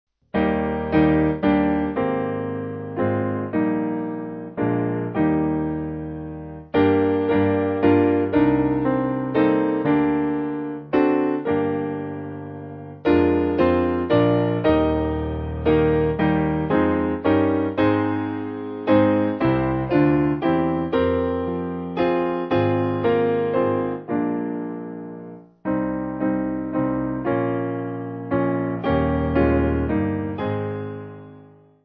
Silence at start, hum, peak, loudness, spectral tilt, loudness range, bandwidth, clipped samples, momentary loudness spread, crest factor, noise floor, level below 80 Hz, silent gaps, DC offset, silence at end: 0.35 s; none; -4 dBFS; -22 LUFS; -11 dB/octave; 5 LU; 5.2 kHz; under 0.1%; 11 LU; 18 dB; -48 dBFS; -38 dBFS; none; under 0.1%; 0.4 s